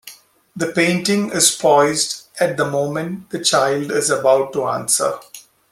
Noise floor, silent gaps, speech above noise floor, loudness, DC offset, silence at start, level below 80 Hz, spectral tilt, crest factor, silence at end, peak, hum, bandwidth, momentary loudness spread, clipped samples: -43 dBFS; none; 26 dB; -17 LUFS; under 0.1%; 0.05 s; -62 dBFS; -3 dB/octave; 18 dB; 0.3 s; 0 dBFS; none; 16 kHz; 9 LU; under 0.1%